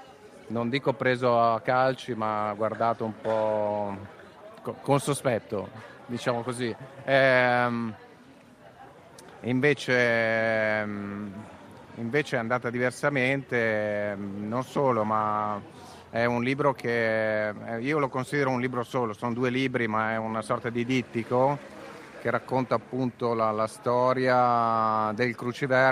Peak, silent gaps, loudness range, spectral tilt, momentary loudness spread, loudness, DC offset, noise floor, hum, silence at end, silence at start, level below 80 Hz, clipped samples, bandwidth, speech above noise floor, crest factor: -6 dBFS; none; 3 LU; -6 dB/octave; 13 LU; -27 LUFS; under 0.1%; -52 dBFS; none; 0 s; 0 s; -68 dBFS; under 0.1%; 15 kHz; 26 dB; 20 dB